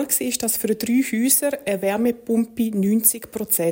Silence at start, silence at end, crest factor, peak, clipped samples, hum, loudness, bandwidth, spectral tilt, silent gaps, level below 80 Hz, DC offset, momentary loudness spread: 0 s; 0 s; 18 dB; -2 dBFS; under 0.1%; none; -20 LUFS; 17 kHz; -3.5 dB/octave; none; -58 dBFS; under 0.1%; 6 LU